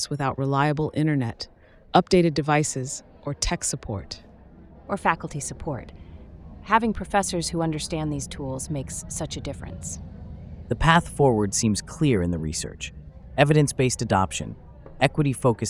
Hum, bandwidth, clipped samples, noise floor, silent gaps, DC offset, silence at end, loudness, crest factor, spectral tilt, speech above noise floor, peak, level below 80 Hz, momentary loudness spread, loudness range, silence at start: none; 15.5 kHz; under 0.1%; -48 dBFS; none; under 0.1%; 0 s; -24 LUFS; 22 dB; -5 dB/octave; 24 dB; -2 dBFS; -42 dBFS; 18 LU; 6 LU; 0 s